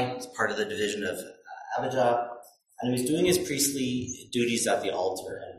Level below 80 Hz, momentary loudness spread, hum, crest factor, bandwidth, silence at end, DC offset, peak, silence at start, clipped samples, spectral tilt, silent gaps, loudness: -60 dBFS; 12 LU; none; 16 dB; 15.5 kHz; 0 s; under 0.1%; -12 dBFS; 0 s; under 0.1%; -3.5 dB/octave; none; -28 LUFS